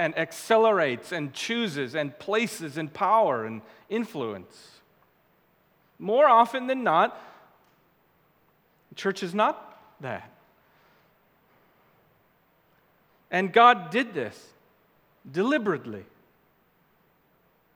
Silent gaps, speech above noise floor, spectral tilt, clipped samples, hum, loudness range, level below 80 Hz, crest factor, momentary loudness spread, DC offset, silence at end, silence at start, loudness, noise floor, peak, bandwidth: none; 40 dB; -4.5 dB/octave; under 0.1%; none; 8 LU; -80 dBFS; 24 dB; 19 LU; under 0.1%; 1.7 s; 0 s; -25 LUFS; -65 dBFS; -4 dBFS; 19.5 kHz